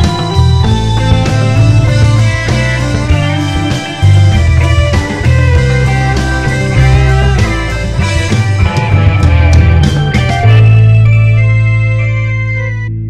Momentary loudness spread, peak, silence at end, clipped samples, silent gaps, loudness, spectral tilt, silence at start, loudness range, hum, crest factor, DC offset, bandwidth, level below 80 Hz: 6 LU; 0 dBFS; 0 s; 0.8%; none; -9 LUFS; -6.5 dB/octave; 0 s; 3 LU; none; 8 dB; under 0.1%; 10.5 kHz; -16 dBFS